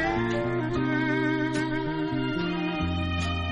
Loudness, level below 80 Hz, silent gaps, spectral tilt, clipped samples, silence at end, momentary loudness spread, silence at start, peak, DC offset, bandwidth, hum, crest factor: -27 LUFS; -42 dBFS; none; -6.5 dB/octave; under 0.1%; 0 s; 3 LU; 0 s; -14 dBFS; under 0.1%; 10.5 kHz; none; 12 dB